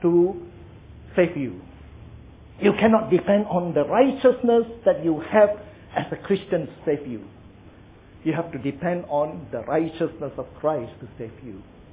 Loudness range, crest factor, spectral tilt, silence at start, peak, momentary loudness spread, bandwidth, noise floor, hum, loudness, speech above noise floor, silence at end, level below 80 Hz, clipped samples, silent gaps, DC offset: 8 LU; 18 dB; -11 dB/octave; 0 s; -6 dBFS; 19 LU; 3.9 kHz; -48 dBFS; none; -23 LUFS; 26 dB; 0.1 s; -52 dBFS; under 0.1%; none; under 0.1%